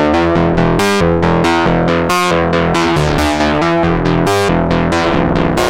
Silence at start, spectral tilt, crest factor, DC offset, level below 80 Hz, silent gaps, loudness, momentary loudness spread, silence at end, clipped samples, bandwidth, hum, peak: 0 s; -6 dB/octave; 10 dB; under 0.1%; -26 dBFS; none; -12 LUFS; 1 LU; 0 s; under 0.1%; 16 kHz; none; -2 dBFS